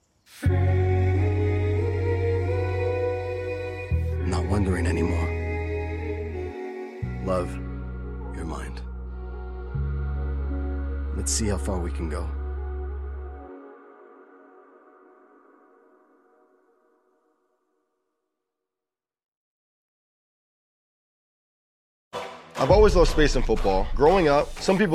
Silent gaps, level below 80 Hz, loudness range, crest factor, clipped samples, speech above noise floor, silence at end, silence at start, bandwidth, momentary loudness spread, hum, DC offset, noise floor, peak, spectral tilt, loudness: 19.28-22.11 s; -32 dBFS; 14 LU; 20 dB; under 0.1%; over 69 dB; 0 s; 0.3 s; 12.5 kHz; 16 LU; none; under 0.1%; under -90 dBFS; -6 dBFS; -6 dB/octave; -26 LUFS